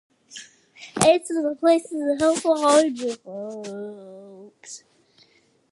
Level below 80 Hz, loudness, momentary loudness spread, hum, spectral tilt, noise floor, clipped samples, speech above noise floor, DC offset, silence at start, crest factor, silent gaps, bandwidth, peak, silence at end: -64 dBFS; -21 LUFS; 23 LU; none; -3.5 dB/octave; -60 dBFS; under 0.1%; 38 dB; under 0.1%; 0.3 s; 24 dB; none; 12.5 kHz; 0 dBFS; 0.95 s